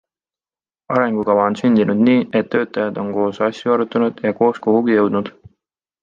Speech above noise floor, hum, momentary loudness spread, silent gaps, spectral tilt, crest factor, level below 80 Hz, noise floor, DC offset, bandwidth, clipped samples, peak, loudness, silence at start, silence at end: over 74 dB; none; 7 LU; none; -7.5 dB/octave; 16 dB; -60 dBFS; under -90 dBFS; under 0.1%; 7.4 kHz; under 0.1%; -2 dBFS; -17 LUFS; 0.9 s; 0.75 s